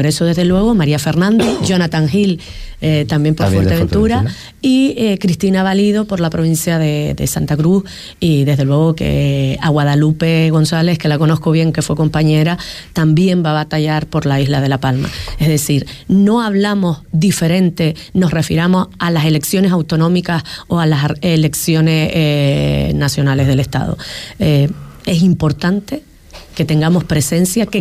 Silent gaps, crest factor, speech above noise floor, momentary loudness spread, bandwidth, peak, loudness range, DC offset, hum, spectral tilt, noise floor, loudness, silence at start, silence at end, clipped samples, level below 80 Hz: none; 10 dB; 23 dB; 6 LU; 15.5 kHz; -4 dBFS; 2 LU; under 0.1%; none; -6 dB/octave; -36 dBFS; -14 LUFS; 0 s; 0 s; under 0.1%; -34 dBFS